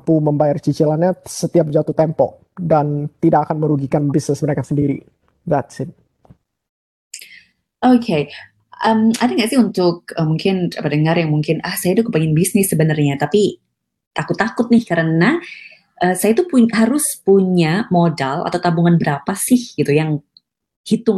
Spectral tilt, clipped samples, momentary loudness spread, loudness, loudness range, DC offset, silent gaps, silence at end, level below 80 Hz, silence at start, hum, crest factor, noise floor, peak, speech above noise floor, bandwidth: -6 dB/octave; under 0.1%; 9 LU; -16 LUFS; 6 LU; under 0.1%; 6.69-7.11 s, 14.07-14.11 s, 20.76-20.84 s; 0 s; -56 dBFS; 0.05 s; none; 14 dB; -51 dBFS; -2 dBFS; 35 dB; 12.5 kHz